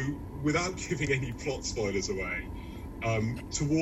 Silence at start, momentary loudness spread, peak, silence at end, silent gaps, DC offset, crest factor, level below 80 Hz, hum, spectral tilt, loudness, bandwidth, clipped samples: 0 s; 7 LU; -16 dBFS; 0 s; none; under 0.1%; 16 dB; -46 dBFS; none; -5 dB/octave; -32 LUFS; 13.5 kHz; under 0.1%